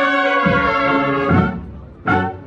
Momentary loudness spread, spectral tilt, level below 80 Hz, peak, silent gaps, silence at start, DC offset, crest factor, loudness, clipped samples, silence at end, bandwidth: 11 LU; -7.5 dB/octave; -38 dBFS; -2 dBFS; none; 0 s; under 0.1%; 14 dB; -16 LUFS; under 0.1%; 0 s; 8 kHz